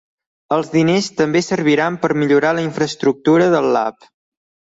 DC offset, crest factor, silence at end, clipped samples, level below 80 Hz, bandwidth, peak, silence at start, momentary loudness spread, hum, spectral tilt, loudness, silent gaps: under 0.1%; 14 dB; 0.8 s; under 0.1%; -58 dBFS; 8 kHz; -2 dBFS; 0.5 s; 6 LU; none; -5.5 dB/octave; -16 LUFS; none